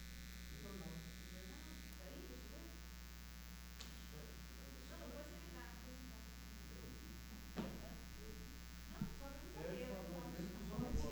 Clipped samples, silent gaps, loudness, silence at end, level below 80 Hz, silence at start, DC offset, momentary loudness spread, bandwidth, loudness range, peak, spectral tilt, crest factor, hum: under 0.1%; none; -52 LUFS; 0 s; -56 dBFS; 0 s; under 0.1%; 7 LU; over 20 kHz; 4 LU; -30 dBFS; -5 dB/octave; 20 dB; 60 Hz at -55 dBFS